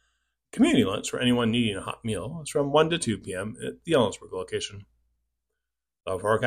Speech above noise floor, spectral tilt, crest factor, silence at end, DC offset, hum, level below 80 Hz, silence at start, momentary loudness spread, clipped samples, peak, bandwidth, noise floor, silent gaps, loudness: 59 dB; -5 dB/octave; 18 dB; 0 s; under 0.1%; none; -56 dBFS; 0.55 s; 13 LU; under 0.1%; -8 dBFS; 15 kHz; -85 dBFS; none; -26 LUFS